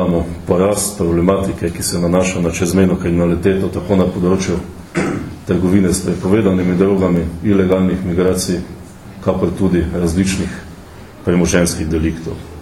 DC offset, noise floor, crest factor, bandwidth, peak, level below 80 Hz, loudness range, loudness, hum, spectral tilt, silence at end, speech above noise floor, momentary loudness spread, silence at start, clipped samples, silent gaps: under 0.1%; -35 dBFS; 16 dB; 13.5 kHz; 0 dBFS; -32 dBFS; 3 LU; -16 LUFS; none; -6 dB/octave; 0 s; 20 dB; 10 LU; 0 s; under 0.1%; none